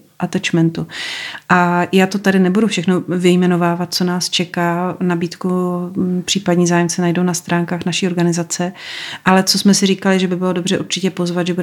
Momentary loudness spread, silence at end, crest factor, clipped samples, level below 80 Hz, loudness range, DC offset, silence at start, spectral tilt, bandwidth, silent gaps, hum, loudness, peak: 7 LU; 0 s; 14 dB; under 0.1%; -62 dBFS; 2 LU; under 0.1%; 0.2 s; -5 dB/octave; 15.5 kHz; none; none; -16 LUFS; 0 dBFS